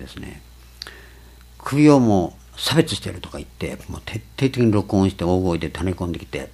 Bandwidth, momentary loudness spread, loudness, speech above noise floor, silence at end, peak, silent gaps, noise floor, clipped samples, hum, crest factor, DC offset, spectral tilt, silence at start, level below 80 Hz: 14.5 kHz; 21 LU; -20 LUFS; 25 dB; 0.05 s; 0 dBFS; none; -45 dBFS; under 0.1%; none; 20 dB; under 0.1%; -6 dB/octave; 0 s; -42 dBFS